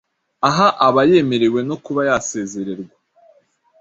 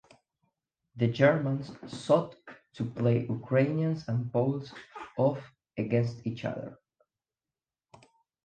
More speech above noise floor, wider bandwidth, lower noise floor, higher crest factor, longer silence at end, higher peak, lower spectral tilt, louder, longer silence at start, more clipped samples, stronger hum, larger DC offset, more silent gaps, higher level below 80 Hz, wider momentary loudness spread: second, 40 dB vs over 61 dB; second, 8 kHz vs 9 kHz; second, -56 dBFS vs under -90 dBFS; about the same, 18 dB vs 22 dB; second, 0.95 s vs 1.7 s; first, 0 dBFS vs -8 dBFS; second, -5 dB/octave vs -8 dB/octave; first, -16 LUFS vs -30 LUFS; second, 0.4 s vs 0.95 s; neither; neither; neither; neither; first, -56 dBFS vs -68 dBFS; second, 14 LU vs 17 LU